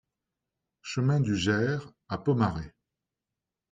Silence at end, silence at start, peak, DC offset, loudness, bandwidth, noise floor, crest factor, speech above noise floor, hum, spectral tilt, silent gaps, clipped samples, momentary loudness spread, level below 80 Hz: 1.05 s; 0.85 s; -12 dBFS; under 0.1%; -28 LUFS; 9.2 kHz; -88 dBFS; 18 dB; 61 dB; none; -6.5 dB/octave; none; under 0.1%; 13 LU; -56 dBFS